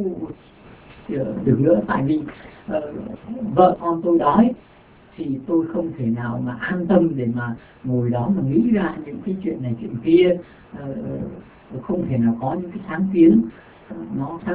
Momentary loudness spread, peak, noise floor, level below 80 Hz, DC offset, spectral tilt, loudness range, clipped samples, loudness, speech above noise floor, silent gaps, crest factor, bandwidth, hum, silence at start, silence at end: 18 LU; -2 dBFS; -46 dBFS; -50 dBFS; under 0.1%; -12 dB/octave; 3 LU; under 0.1%; -21 LUFS; 26 dB; none; 20 dB; 4 kHz; none; 0 s; 0 s